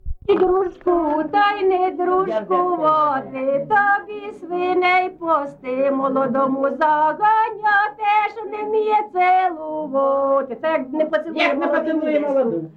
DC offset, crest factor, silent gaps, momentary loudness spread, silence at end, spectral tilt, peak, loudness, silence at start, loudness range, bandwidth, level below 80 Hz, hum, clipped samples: under 0.1%; 14 dB; none; 6 LU; 0.05 s; -6.5 dB/octave; -6 dBFS; -19 LUFS; 0.05 s; 2 LU; 6.8 kHz; -46 dBFS; none; under 0.1%